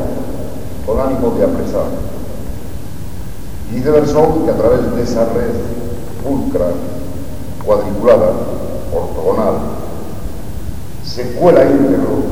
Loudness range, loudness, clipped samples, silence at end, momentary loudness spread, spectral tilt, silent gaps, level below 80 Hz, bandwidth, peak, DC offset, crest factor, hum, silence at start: 4 LU; -15 LUFS; 0.1%; 0 s; 17 LU; -7.5 dB/octave; none; -30 dBFS; 18 kHz; 0 dBFS; 10%; 16 dB; none; 0 s